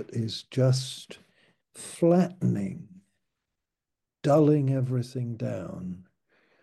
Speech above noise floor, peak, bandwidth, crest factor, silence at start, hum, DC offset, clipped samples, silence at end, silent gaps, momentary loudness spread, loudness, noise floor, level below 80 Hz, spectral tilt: 61 dB; -10 dBFS; 12.5 kHz; 18 dB; 0 s; none; under 0.1%; under 0.1%; 0.6 s; none; 19 LU; -27 LUFS; -87 dBFS; -68 dBFS; -7 dB/octave